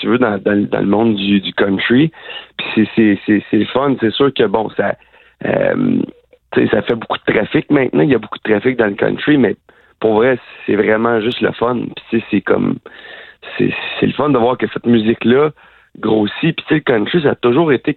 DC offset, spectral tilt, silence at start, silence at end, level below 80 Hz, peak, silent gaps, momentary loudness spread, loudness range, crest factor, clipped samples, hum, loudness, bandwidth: under 0.1%; -9.5 dB/octave; 0 s; 0 s; -50 dBFS; 0 dBFS; none; 8 LU; 2 LU; 14 dB; under 0.1%; none; -15 LUFS; 4.4 kHz